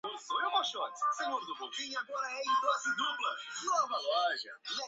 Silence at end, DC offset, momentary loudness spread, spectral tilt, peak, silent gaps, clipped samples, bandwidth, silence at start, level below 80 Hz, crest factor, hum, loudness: 0 s; under 0.1%; 7 LU; 3 dB/octave; -18 dBFS; none; under 0.1%; 8 kHz; 0.05 s; -90 dBFS; 16 dB; none; -34 LUFS